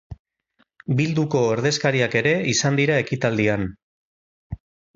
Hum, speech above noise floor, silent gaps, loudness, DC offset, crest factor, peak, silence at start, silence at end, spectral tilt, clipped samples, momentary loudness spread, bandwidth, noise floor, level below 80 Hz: none; 46 dB; 0.19-0.25 s, 3.83-4.50 s; -21 LUFS; under 0.1%; 18 dB; -4 dBFS; 0.1 s; 0.4 s; -5 dB/octave; under 0.1%; 19 LU; 7.8 kHz; -66 dBFS; -50 dBFS